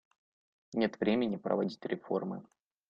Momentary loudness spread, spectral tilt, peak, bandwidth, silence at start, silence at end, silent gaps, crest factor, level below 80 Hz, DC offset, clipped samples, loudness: 10 LU; -7.5 dB/octave; -14 dBFS; 7.2 kHz; 0.7 s; 0.5 s; none; 20 dB; -70 dBFS; under 0.1%; under 0.1%; -34 LUFS